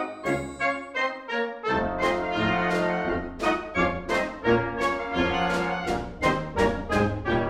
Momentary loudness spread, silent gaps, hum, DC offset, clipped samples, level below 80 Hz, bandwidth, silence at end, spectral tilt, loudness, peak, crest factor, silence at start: 4 LU; none; none; under 0.1%; under 0.1%; -44 dBFS; 15 kHz; 0 s; -5.5 dB/octave; -26 LUFS; -8 dBFS; 18 dB; 0 s